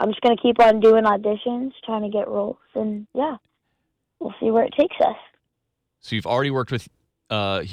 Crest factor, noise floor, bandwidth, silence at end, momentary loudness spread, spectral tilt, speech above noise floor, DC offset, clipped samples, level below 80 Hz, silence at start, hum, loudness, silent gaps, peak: 14 dB; -78 dBFS; 9.8 kHz; 0 s; 14 LU; -7 dB/octave; 58 dB; under 0.1%; under 0.1%; -58 dBFS; 0 s; none; -21 LUFS; none; -8 dBFS